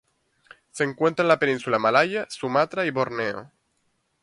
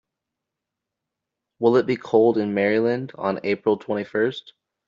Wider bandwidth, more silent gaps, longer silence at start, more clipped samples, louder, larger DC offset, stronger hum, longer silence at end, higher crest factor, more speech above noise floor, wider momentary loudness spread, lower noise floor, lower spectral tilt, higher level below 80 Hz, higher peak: first, 11.5 kHz vs 7.2 kHz; neither; second, 0.75 s vs 1.6 s; neither; about the same, -23 LUFS vs -22 LUFS; neither; neither; first, 0.75 s vs 0.4 s; about the same, 20 dB vs 18 dB; second, 48 dB vs 63 dB; about the same, 9 LU vs 7 LU; second, -71 dBFS vs -84 dBFS; about the same, -5 dB/octave vs -5 dB/octave; about the same, -68 dBFS vs -66 dBFS; about the same, -4 dBFS vs -4 dBFS